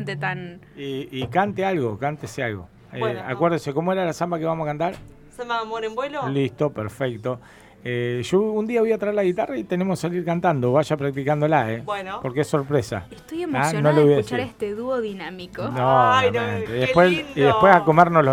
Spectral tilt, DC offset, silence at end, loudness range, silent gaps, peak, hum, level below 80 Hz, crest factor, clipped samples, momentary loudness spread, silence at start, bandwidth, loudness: -6.5 dB/octave; under 0.1%; 0 s; 6 LU; none; 0 dBFS; none; -54 dBFS; 22 dB; under 0.1%; 14 LU; 0 s; 16 kHz; -22 LUFS